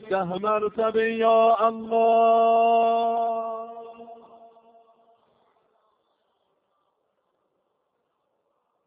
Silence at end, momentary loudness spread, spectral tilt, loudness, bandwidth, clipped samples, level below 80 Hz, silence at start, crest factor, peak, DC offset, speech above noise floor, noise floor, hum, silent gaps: 4.75 s; 15 LU; -3.5 dB/octave; -22 LUFS; 4.9 kHz; under 0.1%; -72 dBFS; 0 s; 16 dB; -8 dBFS; under 0.1%; 54 dB; -75 dBFS; none; none